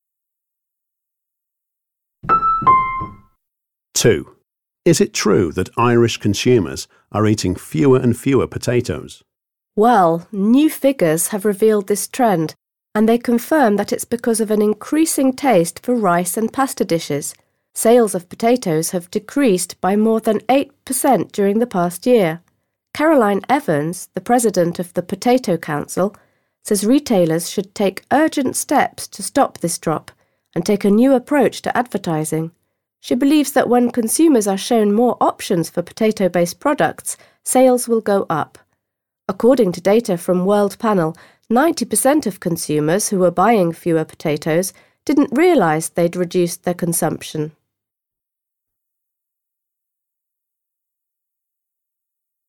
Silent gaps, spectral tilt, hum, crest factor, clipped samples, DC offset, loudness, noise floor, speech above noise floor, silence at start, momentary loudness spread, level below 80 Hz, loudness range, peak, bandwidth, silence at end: none; -5 dB/octave; none; 16 dB; under 0.1%; under 0.1%; -17 LUFS; -84 dBFS; 68 dB; 2.25 s; 10 LU; -52 dBFS; 3 LU; -2 dBFS; 19 kHz; 5 s